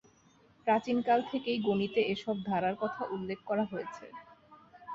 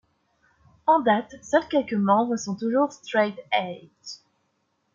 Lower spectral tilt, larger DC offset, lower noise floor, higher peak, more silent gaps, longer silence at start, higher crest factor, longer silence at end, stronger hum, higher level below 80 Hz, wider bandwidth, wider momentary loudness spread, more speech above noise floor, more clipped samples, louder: first, -6.5 dB/octave vs -5 dB/octave; neither; second, -64 dBFS vs -72 dBFS; second, -14 dBFS vs -6 dBFS; neither; second, 0.65 s vs 0.85 s; about the same, 18 dB vs 20 dB; second, 0 s vs 0.8 s; neither; about the same, -70 dBFS vs -68 dBFS; about the same, 7.6 kHz vs 7.6 kHz; second, 15 LU vs 19 LU; second, 32 dB vs 48 dB; neither; second, -32 LUFS vs -24 LUFS